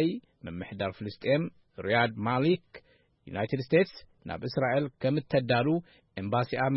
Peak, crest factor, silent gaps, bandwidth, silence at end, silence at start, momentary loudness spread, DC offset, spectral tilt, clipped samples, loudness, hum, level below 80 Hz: -12 dBFS; 18 dB; none; 5.8 kHz; 0 s; 0 s; 14 LU; under 0.1%; -10.5 dB/octave; under 0.1%; -30 LUFS; none; -62 dBFS